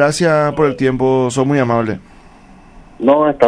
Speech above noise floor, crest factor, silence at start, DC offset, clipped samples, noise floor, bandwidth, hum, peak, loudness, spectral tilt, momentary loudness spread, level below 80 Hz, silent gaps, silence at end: 28 dB; 14 dB; 0 s; under 0.1%; 0.1%; -41 dBFS; 11 kHz; none; 0 dBFS; -14 LUFS; -6 dB/octave; 6 LU; -42 dBFS; none; 0 s